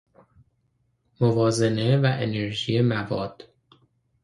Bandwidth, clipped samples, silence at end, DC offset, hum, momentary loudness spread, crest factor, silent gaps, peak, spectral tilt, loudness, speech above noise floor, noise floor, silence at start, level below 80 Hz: 11.5 kHz; under 0.1%; 0.8 s; under 0.1%; none; 8 LU; 20 dB; none; -6 dBFS; -6.5 dB/octave; -23 LUFS; 47 dB; -70 dBFS; 1.2 s; -58 dBFS